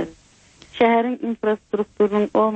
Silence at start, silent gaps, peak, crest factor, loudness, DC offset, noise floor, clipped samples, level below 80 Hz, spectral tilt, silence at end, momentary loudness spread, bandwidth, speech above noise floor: 0 s; none; -4 dBFS; 16 dB; -20 LUFS; under 0.1%; -52 dBFS; under 0.1%; -58 dBFS; -7 dB/octave; 0 s; 10 LU; 8.4 kHz; 33 dB